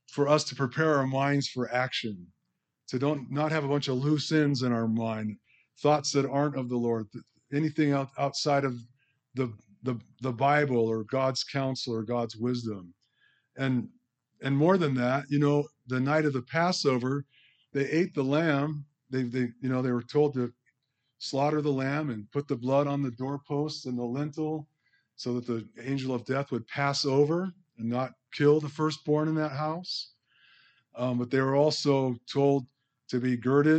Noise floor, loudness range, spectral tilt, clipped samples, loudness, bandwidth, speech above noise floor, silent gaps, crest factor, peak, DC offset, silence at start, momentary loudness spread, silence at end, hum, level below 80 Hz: -81 dBFS; 4 LU; -6 dB/octave; under 0.1%; -29 LUFS; 8.8 kHz; 53 dB; none; 18 dB; -10 dBFS; under 0.1%; 0.1 s; 10 LU; 0 s; none; -76 dBFS